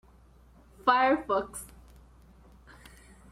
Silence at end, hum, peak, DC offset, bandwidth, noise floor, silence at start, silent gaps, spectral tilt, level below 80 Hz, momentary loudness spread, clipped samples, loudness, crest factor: 1.65 s; none; -8 dBFS; under 0.1%; 15.5 kHz; -57 dBFS; 0.85 s; none; -3.5 dB/octave; -56 dBFS; 19 LU; under 0.1%; -27 LUFS; 24 dB